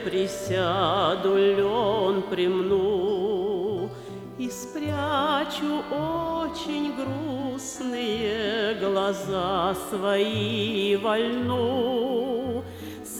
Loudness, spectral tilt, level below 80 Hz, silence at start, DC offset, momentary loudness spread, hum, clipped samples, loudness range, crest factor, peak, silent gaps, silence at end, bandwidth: -26 LUFS; -5 dB/octave; -54 dBFS; 0 s; under 0.1%; 9 LU; none; under 0.1%; 4 LU; 14 dB; -10 dBFS; none; 0 s; 16.5 kHz